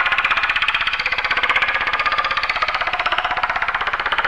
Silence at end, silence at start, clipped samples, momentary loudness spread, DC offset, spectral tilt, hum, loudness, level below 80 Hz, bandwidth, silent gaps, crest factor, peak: 0 s; 0 s; under 0.1%; 3 LU; under 0.1%; -2 dB/octave; none; -18 LUFS; -42 dBFS; 12 kHz; none; 14 dB; -4 dBFS